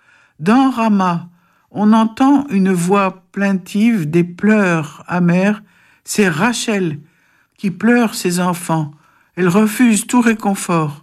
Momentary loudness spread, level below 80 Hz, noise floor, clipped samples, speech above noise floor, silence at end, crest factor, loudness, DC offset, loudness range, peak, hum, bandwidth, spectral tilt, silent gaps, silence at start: 9 LU; -58 dBFS; -56 dBFS; under 0.1%; 42 dB; 0.05 s; 12 dB; -15 LUFS; under 0.1%; 3 LU; -2 dBFS; none; 15 kHz; -5.5 dB/octave; none; 0.4 s